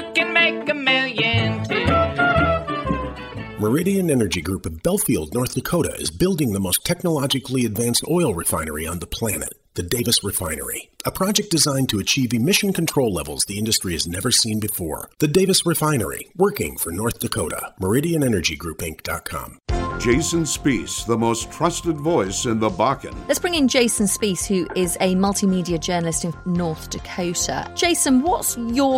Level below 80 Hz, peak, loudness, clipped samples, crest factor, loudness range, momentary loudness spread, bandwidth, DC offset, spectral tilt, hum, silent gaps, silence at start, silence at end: -40 dBFS; -4 dBFS; -20 LUFS; under 0.1%; 18 dB; 3 LU; 9 LU; 16.5 kHz; under 0.1%; -4 dB/octave; none; none; 0 s; 0 s